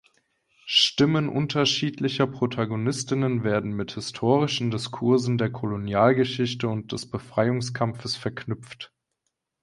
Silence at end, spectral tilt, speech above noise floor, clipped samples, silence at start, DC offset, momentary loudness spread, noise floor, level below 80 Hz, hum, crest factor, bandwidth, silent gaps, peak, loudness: 0.75 s; -5 dB/octave; 55 dB; under 0.1%; 0.65 s; under 0.1%; 12 LU; -80 dBFS; -58 dBFS; none; 20 dB; 11.5 kHz; none; -6 dBFS; -25 LUFS